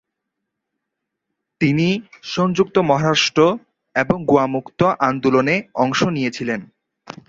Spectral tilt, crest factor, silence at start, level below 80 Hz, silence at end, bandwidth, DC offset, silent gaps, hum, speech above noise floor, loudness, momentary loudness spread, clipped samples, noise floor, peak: -5.5 dB/octave; 18 dB; 1.6 s; -54 dBFS; 0.65 s; 7.8 kHz; under 0.1%; none; none; 62 dB; -18 LUFS; 9 LU; under 0.1%; -80 dBFS; -2 dBFS